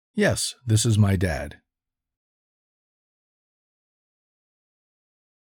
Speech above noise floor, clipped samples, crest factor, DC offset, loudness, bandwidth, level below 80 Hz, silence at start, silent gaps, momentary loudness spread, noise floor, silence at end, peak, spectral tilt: 65 dB; under 0.1%; 20 dB; under 0.1%; -23 LUFS; 17.5 kHz; -48 dBFS; 0.15 s; none; 10 LU; -86 dBFS; 3.95 s; -8 dBFS; -5 dB/octave